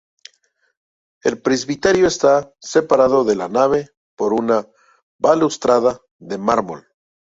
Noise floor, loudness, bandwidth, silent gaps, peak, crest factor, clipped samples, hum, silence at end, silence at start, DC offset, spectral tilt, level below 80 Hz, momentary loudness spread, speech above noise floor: -63 dBFS; -17 LUFS; 8 kHz; 3.97-4.17 s, 5.02-5.19 s, 6.11-6.19 s; -2 dBFS; 16 dB; under 0.1%; none; 0.6 s; 1.25 s; under 0.1%; -4.5 dB/octave; -54 dBFS; 9 LU; 47 dB